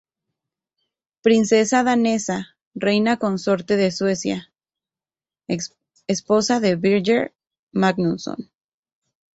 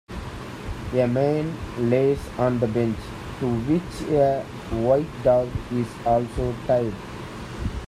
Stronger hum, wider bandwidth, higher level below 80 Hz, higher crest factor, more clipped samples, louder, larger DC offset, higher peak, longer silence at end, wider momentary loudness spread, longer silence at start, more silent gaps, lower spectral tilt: neither; second, 8.2 kHz vs 14.5 kHz; second, -62 dBFS vs -40 dBFS; about the same, 18 dB vs 16 dB; neither; first, -20 LUFS vs -24 LUFS; neither; about the same, -4 dBFS vs -6 dBFS; first, 0.9 s vs 0 s; about the same, 13 LU vs 14 LU; first, 1.25 s vs 0.1 s; first, 2.67-2.71 s, 7.59-7.67 s vs none; second, -5 dB/octave vs -7.5 dB/octave